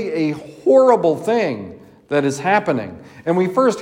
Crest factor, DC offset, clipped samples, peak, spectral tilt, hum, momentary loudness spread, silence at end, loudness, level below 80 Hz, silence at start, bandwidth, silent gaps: 16 dB; under 0.1%; under 0.1%; -2 dBFS; -6 dB/octave; none; 14 LU; 0 s; -17 LUFS; -64 dBFS; 0 s; 15.5 kHz; none